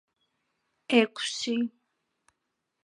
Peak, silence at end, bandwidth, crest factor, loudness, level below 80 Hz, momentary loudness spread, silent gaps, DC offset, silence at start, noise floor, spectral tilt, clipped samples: -8 dBFS; 1.15 s; 11 kHz; 24 dB; -27 LUFS; -86 dBFS; 7 LU; none; under 0.1%; 0.9 s; -82 dBFS; -3 dB/octave; under 0.1%